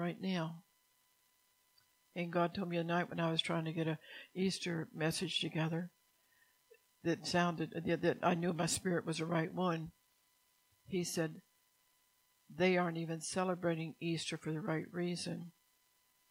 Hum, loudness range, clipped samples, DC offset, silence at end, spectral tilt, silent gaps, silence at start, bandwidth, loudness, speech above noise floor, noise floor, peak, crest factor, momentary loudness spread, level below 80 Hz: none; 4 LU; under 0.1%; under 0.1%; 0.8 s; -5 dB/octave; none; 0 s; 16 kHz; -38 LUFS; 38 dB; -75 dBFS; -18 dBFS; 20 dB; 9 LU; -76 dBFS